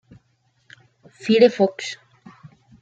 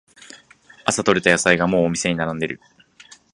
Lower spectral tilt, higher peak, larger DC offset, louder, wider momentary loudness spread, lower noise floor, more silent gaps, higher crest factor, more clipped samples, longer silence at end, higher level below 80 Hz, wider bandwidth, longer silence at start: first, -5.5 dB/octave vs -4 dB/octave; about the same, -2 dBFS vs 0 dBFS; neither; about the same, -19 LUFS vs -19 LUFS; first, 17 LU vs 11 LU; first, -65 dBFS vs -50 dBFS; neither; about the same, 22 dB vs 22 dB; neither; about the same, 0.85 s vs 0.75 s; second, -70 dBFS vs -52 dBFS; second, 8 kHz vs 11.5 kHz; first, 1.25 s vs 0.2 s